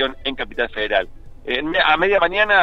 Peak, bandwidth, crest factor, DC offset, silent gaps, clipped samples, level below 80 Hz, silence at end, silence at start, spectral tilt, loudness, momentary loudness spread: -2 dBFS; 6.8 kHz; 16 dB; under 0.1%; none; under 0.1%; -40 dBFS; 0 s; 0 s; -5 dB/octave; -19 LUFS; 10 LU